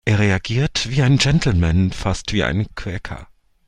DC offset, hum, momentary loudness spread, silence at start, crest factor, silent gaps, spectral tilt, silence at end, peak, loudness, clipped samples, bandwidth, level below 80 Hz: under 0.1%; none; 13 LU; 0.05 s; 16 dB; none; -5.5 dB/octave; 0.45 s; -2 dBFS; -19 LUFS; under 0.1%; 11 kHz; -34 dBFS